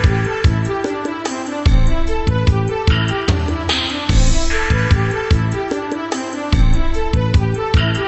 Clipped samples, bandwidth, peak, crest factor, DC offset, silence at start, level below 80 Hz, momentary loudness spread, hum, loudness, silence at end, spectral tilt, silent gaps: under 0.1%; 8.4 kHz; -2 dBFS; 14 dB; under 0.1%; 0 s; -18 dBFS; 6 LU; none; -18 LUFS; 0 s; -5.5 dB/octave; none